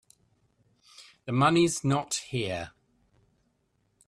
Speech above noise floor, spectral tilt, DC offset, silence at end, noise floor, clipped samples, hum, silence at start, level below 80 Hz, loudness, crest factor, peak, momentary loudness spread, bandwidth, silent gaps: 46 dB; -5 dB/octave; under 0.1%; 1.4 s; -73 dBFS; under 0.1%; none; 1 s; -64 dBFS; -27 LUFS; 22 dB; -10 dBFS; 17 LU; 13 kHz; none